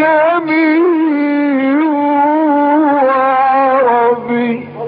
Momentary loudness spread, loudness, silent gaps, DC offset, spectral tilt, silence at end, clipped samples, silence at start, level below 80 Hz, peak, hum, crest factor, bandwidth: 3 LU; -12 LUFS; none; under 0.1%; -3.5 dB/octave; 0 s; under 0.1%; 0 s; -64 dBFS; -2 dBFS; none; 10 dB; 5 kHz